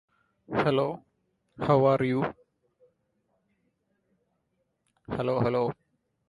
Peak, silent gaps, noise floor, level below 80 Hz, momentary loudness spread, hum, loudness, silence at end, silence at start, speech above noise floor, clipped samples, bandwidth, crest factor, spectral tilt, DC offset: -8 dBFS; none; -77 dBFS; -62 dBFS; 13 LU; none; -27 LUFS; 0.55 s; 0.5 s; 51 dB; under 0.1%; 11.5 kHz; 22 dB; -8.5 dB/octave; under 0.1%